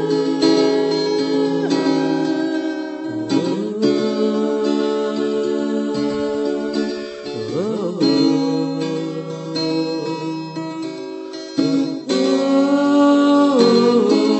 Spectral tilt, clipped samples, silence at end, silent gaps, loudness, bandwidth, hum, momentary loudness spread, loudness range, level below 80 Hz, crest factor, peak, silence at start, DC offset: -5.5 dB/octave; under 0.1%; 0 s; none; -18 LUFS; 8.4 kHz; none; 12 LU; 5 LU; -64 dBFS; 14 dB; -2 dBFS; 0 s; under 0.1%